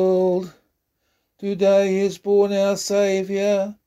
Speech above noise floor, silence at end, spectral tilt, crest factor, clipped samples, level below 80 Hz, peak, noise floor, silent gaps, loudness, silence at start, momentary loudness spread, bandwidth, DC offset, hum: 52 dB; 0.15 s; -5.5 dB/octave; 14 dB; under 0.1%; -64 dBFS; -8 dBFS; -71 dBFS; none; -20 LUFS; 0 s; 9 LU; 14.5 kHz; under 0.1%; none